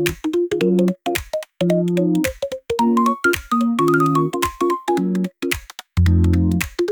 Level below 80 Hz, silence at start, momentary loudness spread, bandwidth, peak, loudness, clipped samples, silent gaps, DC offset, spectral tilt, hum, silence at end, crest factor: -40 dBFS; 0 s; 8 LU; over 20 kHz; -2 dBFS; -19 LUFS; under 0.1%; none; under 0.1%; -6.5 dB/octave; none; 0 s; 16 dB